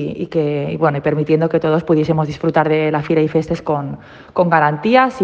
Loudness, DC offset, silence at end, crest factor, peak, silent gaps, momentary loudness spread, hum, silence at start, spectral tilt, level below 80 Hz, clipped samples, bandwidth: -16 LUFS; under 0.1%; 0 s; 16 dB; 0 dBFS; none; 7 LU; none; 0 s; -8 dB/octave; -50 dBFS; under 0.1%; 7.6 kHz